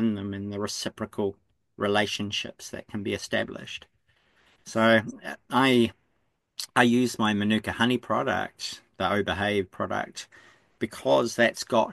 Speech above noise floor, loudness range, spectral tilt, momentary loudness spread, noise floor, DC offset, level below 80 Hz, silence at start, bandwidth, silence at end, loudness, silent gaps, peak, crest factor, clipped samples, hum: 48 dB; 6 LU; -4.5 dB/octave; 15 LU; -74 dBFS; under 0.1%; -62 dBFS; 0 s; 12.5 kHz; 0 s; -26 LUFS; none; -6 dBFS; 22 dB; under 0.1%; none